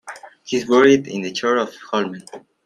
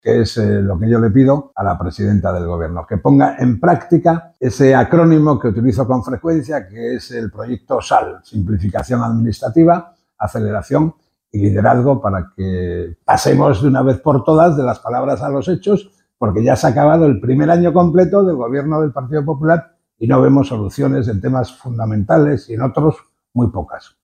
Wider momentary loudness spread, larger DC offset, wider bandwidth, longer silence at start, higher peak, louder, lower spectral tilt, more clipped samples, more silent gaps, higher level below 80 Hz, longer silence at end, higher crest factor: first, 22 LU vs 11 LU; neither; second, 11.5 kHz vs 14.5 kHz; about the same, 0.05 s vs 0.05 s; about the same, -2 dBFS vs 0 dBFS; second, -18 LUFS vs -15 LUFS; second, -4.5 dB/octave vs -8 dB/octave; neither; neither; second, -62 dBFS vs -40 dBFS; about the same, 0.25 s vs 0.25 s; about the same, 18 dB vs 14 dB